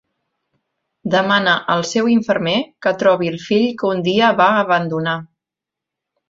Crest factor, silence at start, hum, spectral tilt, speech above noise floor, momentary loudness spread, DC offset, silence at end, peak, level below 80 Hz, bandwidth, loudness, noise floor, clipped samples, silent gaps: 16 dB; 1.05 s; none; -5 dB/octave; 69 dB; 7 LU; under 0.1%; 1.05 s; -2 dBFS; -60 dBFS; 7.8 kHz; -16 LUFS; -85 dBFS; under 0.1%; none